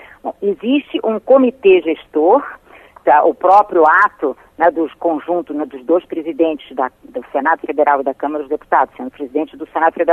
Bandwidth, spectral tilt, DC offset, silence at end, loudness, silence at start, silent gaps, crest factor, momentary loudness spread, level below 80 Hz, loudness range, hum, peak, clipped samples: 5.8 kHz; -6.5 dB/octave; under 0.1%; 0 s; -15 LUFS; 0.25 s; none; 14 dB; 12 LU; -58 dBFS; 5 LU; none; -2 dBFS; under 0.1%